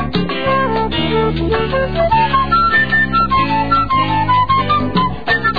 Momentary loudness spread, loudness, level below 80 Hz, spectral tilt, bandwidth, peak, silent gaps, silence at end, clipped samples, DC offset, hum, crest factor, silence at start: 5 LU; -14 LUFS; -30 dBFS; -8 dB/octave; 5 kHz; -2 dBFS; none; 0 s; under 0.1%; 3%; none; 12 dB; 0 s